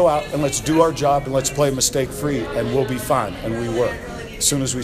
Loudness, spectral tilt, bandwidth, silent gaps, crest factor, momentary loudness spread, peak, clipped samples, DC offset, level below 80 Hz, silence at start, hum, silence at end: -20 LUFS; -4 dB/octave; 15.5 kHz; none; 18 dB; 7 LU; -2 dBFS; under 0.1%; under 0.1%; -40 dBFS; 0 s; none; 0 s